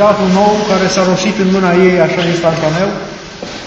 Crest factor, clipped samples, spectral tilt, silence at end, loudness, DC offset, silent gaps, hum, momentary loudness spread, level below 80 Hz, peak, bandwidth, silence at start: 12 dB; 0.1%; -5.5 dB/octave; 0 s; -11 LUFS; under 0.1%; none; none; 13 LU; -42 dBFS; 0 dBFS; 8.2 kHz; 0 s